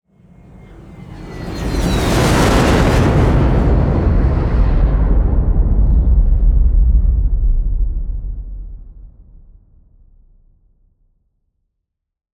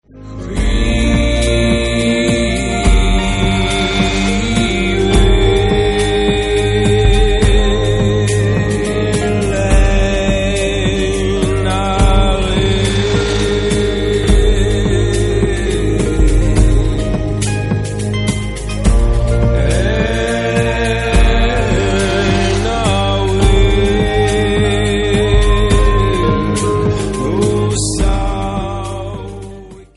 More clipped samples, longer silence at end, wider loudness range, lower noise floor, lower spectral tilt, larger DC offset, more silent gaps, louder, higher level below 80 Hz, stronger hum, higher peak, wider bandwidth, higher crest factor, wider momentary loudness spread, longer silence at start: neither; first, 3.3 s vs 0.15 s; first, 12 LU vs 3 LU; first, -77 dBFS vs -33 dBFS; about the same, -6.5 dB/octave vs -5.5 dB/octave; neither; neither; about the same, -15 LUFS vs -14 LUFS; about the same, -16 dBFS vs -16 dBFS; neither; about the same, -2 dBFS vs 0 dBFS; first, 13.5 kHz vs 11.5 kHz; about the same, 14 dB vs 12 dB; first, 17 LU vs 5 LU; first, 0.7 s vs 0.15 s